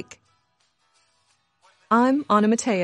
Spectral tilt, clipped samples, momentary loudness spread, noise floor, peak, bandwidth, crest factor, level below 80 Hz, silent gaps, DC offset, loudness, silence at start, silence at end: -5 dB/octave; under 0.1%; 5 LU; -68 dBFS; -6 dBFS; 11 kHz; 18 dB; -70 dBFS; none; under 0.1%; -20 LUFS; 1.9 s; 0 s